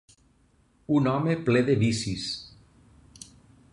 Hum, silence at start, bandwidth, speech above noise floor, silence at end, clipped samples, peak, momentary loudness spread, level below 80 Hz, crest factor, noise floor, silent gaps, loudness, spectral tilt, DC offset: none; 0.9 s; 11.5 kHz; 39 dB; 1.25 s; under 0.1%; -10 dBFS; 24 LU; -56 dBFS; 18 dB; -63 dBFS; none; -26 LUFS; -6 dB/octave; under 0.1%